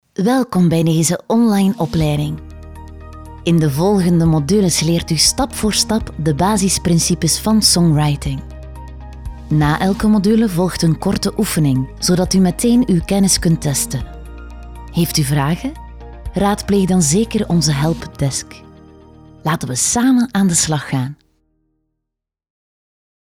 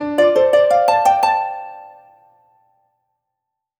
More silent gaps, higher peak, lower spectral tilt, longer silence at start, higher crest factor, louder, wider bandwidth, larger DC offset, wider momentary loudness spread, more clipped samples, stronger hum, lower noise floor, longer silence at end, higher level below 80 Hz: neither; about the same, 0 dBFS vs -2 dBFS; about the same, -5 dB/octave vs -4 dB/octave; first, 0.2 s vs 0 s; about the same, 16 dB vs 16 dB; about the same, -15 LUFS vs -15 LUFS; second, 17.5 kHz vs over 20 kHz; neither; first, 20 LU vs 15 LU; neither; neither; about the same, -80 dBFS vs -80 dBFS; first, 2.1 s vs 1.9 s; first, -34 dBFS vs -62 dBFS